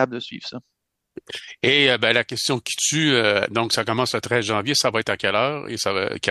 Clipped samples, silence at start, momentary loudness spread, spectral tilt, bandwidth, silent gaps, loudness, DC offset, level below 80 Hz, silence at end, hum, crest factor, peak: under 0.1%; 0 s; 16 LU; -3 dB/octave; 12.5 kHz; none; -20 LUFS; under 0.1%; -62 dBFS; 0 s; none; 20 dB; -2 dBFS